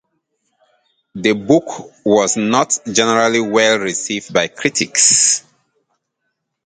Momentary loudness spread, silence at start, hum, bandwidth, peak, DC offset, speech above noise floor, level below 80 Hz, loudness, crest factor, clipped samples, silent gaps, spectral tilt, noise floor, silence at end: 9 LU; 1.15 s; none; 9.6 kHz; 0 dBFS; under 0.1%; 58 dB; -58 dBFS; -14 LUFS; 18 dB; under 0.1%; none; -2 dB/octave; -73 dBFS; 1.25 s